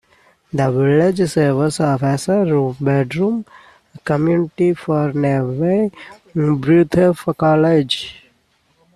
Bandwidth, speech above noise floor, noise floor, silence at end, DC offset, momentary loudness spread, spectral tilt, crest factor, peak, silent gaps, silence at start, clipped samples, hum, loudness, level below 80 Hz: 13 kHz; 44 dB; -60 dBFS; 0.85 s; under 0.1%; 7 LU; -7 dB/octave; 14 dB; -2 dBFS; none; 0.55 s; under 0.1%; none; -17 LUFS; -52 dBFS